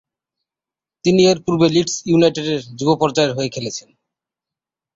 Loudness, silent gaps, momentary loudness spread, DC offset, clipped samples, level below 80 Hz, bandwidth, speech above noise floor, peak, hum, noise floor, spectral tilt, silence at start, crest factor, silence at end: -17 LUFS; none; 9 LU; under 0.1%; under 0.1%; -56 dBFS; 8 kHz; 72 dB; -2 dBFS; none; -89 dBFS; -5 dB/octave; 1.05 s; 16 dB; 1.15 s